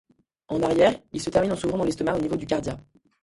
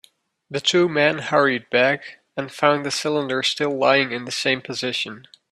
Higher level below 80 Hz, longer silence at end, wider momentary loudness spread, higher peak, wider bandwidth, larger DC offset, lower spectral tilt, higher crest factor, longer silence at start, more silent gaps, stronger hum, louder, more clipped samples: first, -50 dBFS vs -66 dBFS; about the same, 0.4 s vs 0.3 s; about the same, 11 LU vs 10 LU; second, -6 dBFS vs -2 dBFS; second, 11.5 kHz vs 13.5 kHz; neither; first, -5.5 dB/octave vs -3.5 dB/octave; about the same, 18 dB vs 20 dB; about the same, 0.5 s vs 0.5 s; neither; neither; second, -25 LUFS vs -20 LUFS; neither